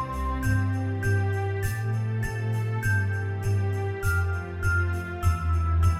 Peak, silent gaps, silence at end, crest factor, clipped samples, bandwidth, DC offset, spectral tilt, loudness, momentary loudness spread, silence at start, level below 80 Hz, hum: -12 dBFS; none; 0 s; 14 dB; under 0.1%; 14 kHz; under 0.1%; -7 dB/octave; -27 LUFS; 3 LU; 0 s; -34 dBFS; none